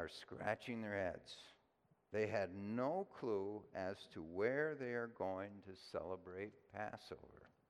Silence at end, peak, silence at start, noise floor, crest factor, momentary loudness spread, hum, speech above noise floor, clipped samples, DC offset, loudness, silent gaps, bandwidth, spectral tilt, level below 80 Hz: 0.25 s; -24 dBFS; 0 s; -78 dBFS; 20 dB; 14 LU; none; 33 dB; under 0.1%; under 0.1%; -45 LUFS; none; 13 kHz; -6.5 dB/octave; -80 dBFS